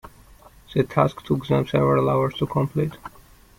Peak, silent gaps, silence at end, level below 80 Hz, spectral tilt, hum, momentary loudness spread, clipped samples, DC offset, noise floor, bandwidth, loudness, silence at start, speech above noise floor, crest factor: -4 dBFS; none; 0.5 s; -50 dBFS; -8 dB/octave; none; 9 LU; under 0.1%; under 0.1%; -49 dBFS; 16 kHz; -22 LUFS; 0.05 s; 28 dB; 20 dB